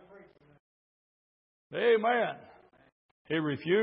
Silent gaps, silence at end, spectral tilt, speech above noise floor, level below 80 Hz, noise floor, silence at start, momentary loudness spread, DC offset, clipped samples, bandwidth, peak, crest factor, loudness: 0.60-1.70 s, 2.92-3.25 s; 0 s; -9 dB/octave; 29 dB; -78 dBFS; -57 dBFS; 0.15 s; 13 LU; under 0.1%; under 0.1%; 5.4 kHz; -16 dBFS; 18 dB; -30 LUFS